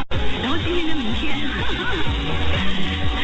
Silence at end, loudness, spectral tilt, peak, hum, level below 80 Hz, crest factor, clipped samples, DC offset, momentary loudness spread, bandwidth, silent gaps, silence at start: 0 s; -23 LUFS; -5.5 dB/octave; -8 dBFS; none; -28 dBFS; 10 dB; under 0.1%; under 0.1%; 2 LU; 8.6 kHz; none; 0 s